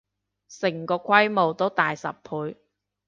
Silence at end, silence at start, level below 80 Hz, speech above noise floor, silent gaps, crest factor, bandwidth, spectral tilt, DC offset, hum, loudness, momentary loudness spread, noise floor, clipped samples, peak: 0.55 s; 0.5 s; -72 dBFS; 31 dB; none; 22 dB; 7.6 kHz; -5 dB/octave; under 0.1%; 50 Hz at -50 dBFS; -24 LUFS; 13 LU; -55 dBFS; under 0.1%; -4 dBFS